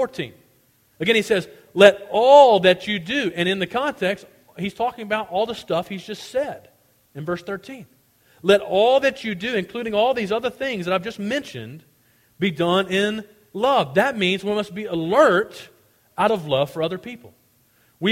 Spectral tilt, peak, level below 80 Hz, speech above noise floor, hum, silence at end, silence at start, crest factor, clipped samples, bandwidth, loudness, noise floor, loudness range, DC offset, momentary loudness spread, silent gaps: -5 dB/octave; 0 dBFS; -60 dBFS; 40 dB; none; 0 s; 0 s; 22 dB; under 0.1%; 16 kHz; -20 LUFS; -60 dBFS; 9 LU; under 0.1%; 18 LU; none